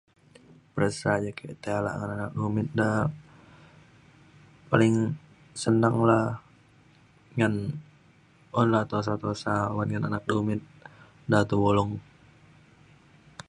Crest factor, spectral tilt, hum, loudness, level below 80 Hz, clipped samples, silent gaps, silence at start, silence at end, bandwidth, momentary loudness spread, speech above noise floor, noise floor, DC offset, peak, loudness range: 24 dB; -7 dB/octave; none; -27 LUFS; -56 dBFS; under 0.1%; none; 0.75 s; 1.5 s; 11 kHz; 15 LU; 33 dB; -58 dBFS; under 0.1%; -6 dBFS; 3 LU